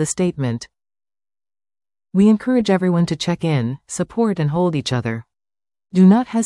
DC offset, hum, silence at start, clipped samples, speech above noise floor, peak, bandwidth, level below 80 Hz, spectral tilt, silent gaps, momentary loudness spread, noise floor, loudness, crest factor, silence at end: under 0.1%; none; 0 s; under 0.1%; over 73 dB; -4 dBFS; 12 kHz; -54 dBFS; -6.5 dB/octave; none; 12 LU; under -90 dBFS; -18 LUFS; 16 dB; 0 s